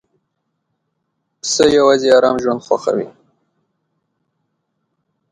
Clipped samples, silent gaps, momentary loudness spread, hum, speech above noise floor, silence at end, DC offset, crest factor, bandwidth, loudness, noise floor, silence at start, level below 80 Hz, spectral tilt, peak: under 0.1%; none; 12 LU; none; 58 dB; 2.2 s; under 0.1%; 18 dB; 11 kHz; -14 LUFS; -72 dBFS; 1.45 s; -54 dBFS; -3.5 dB/octave; 0 dBFS